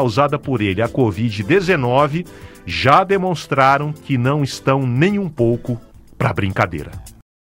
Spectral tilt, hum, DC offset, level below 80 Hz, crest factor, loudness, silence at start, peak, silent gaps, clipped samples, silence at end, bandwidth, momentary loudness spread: -6.5 dB/octave; none; under 0.1%; -44 dBFS; 18 dB; -17 LUFS; 0 s; 0 dBFS; none; under 0.1%; 0.35 s; 16 kHz; 13 LU